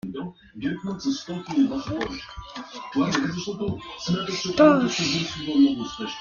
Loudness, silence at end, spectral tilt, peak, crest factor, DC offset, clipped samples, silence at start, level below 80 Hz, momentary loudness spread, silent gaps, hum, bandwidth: -24 LUFS; 0 s; -5 dB/octave; -4 dBFS; 20 dB; under 0.1%; under 0.1%; 0.05 s; -52 dBFS; 18 LU; none; none; 7.2 kHz